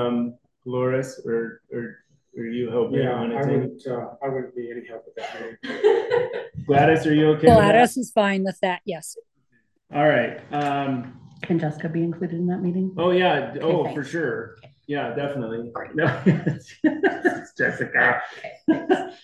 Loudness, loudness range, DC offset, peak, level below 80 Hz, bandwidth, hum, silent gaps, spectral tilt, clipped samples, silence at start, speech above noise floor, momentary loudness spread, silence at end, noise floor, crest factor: -22 LUFS; 8 LU; under 0.1%; -2 dBFS; -52 dBFS; 12.5 kHz; none; none; -6.5 dB/octave; under 0.1%; 0 s; 45 dB; 16 LU; 0.1 s; -68 dBFS; 22 dB